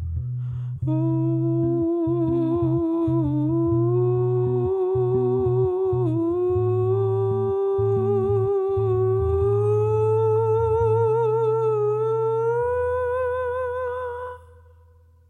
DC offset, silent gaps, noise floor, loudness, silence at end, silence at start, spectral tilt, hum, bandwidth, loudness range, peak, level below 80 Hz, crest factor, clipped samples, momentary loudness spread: under 0.1%; none; -53 dBFS; -22 LUFS; 0.9 s; 0 s; -11 dB/octave; none; 3.9 kHz; 2 LU; -12 dBFS; -44 dBFS; 10 dB; under 0.1%; 6 LU